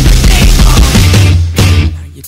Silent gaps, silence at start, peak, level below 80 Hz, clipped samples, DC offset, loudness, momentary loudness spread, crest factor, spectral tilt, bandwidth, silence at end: none; 0 s; 0 dBFS; -8 dBFS; 0.7%; under 0.1%; -7 LUFS; 3 LU; 6 dB; -4.5 dB/octave; 16.5 kHz; 0 s